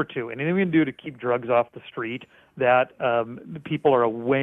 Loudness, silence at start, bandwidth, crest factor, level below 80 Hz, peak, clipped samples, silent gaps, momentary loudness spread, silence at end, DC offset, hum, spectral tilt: -24 LUFS; 0 s; 3.9 kHz; 16 dB; -64 dBFS; -8 dBFS; under 0.1%; none; 12 LU; 0 s; under 0.1%; none; -9 dB/octave